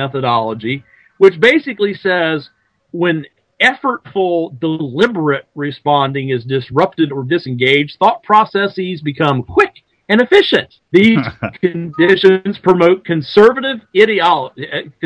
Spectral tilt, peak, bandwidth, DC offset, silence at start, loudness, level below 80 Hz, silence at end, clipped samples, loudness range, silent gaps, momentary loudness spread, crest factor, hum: -6.5 dB/octave; 0 dBFS; 9.2 kHz; under 0.1%; 0 s; -14 LUFS; -54 dBFS; 0.15 s; 0.5%; 4 LU; none; 10 LU; 14 dB; none